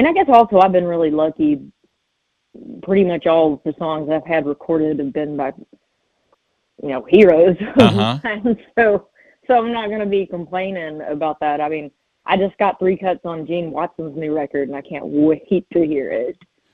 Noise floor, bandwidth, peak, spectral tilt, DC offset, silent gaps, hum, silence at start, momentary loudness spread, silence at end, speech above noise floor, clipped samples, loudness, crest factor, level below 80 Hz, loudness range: -71 dBFS; 9.8 kHz; 0 dBFS; -7.5 dB/octave; under 0.1%; none; none; 0 s; 14 LU; 0.4 s; 54 dB; under 0.1%; -17 LUFS; 18 dB; -52 dBFS; 6 LU